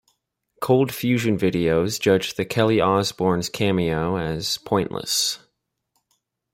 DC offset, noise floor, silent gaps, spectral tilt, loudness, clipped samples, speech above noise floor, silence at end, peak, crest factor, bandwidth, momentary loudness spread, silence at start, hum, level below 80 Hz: under 0.1%; -74 dBFS; none; -4.5 dB/octave; -21 LUFS; under 0.1%; 53 dB; 1.15 s; -4 dBFS; 18 dB; 16.5 kHz; 5 LU; 0.6 s; none; -52 dBFS